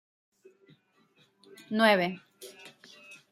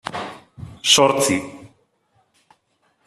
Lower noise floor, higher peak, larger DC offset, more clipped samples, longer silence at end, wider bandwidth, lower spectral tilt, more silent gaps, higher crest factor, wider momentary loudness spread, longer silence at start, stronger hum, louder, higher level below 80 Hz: about the same, -67 dBFS vs -66 dBFS; second, -8 dBFS vs -2 dBFS; neither; neither; second, 0.15 s vs 1.4 s; about the same, 15 kHz vs 14 kHz; first, -5 dB/octave vs -2 dB/octave; neither; about the same, 26 dB vs 22 dB; about the same, 27 LU vs 25 LU; first, 1.7 s vs 0.05 s; neither; second, -26 LUFS vs -17 LUFS; second, -84 dBFS vs -58 dBFS